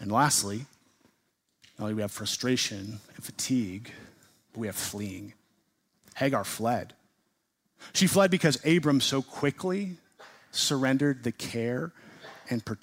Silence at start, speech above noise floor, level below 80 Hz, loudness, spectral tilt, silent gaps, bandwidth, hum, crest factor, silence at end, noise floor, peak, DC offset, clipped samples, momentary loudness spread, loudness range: 0 s; 48 dB; -68 dBFS; -28 LUFS; -4 dB/octave; none; 16 kHz; none; 20 dB; 0.05 s; -76 dBFS; -10 dBFS; under 0.1%; under 0.1%; 21 LU; 8 LU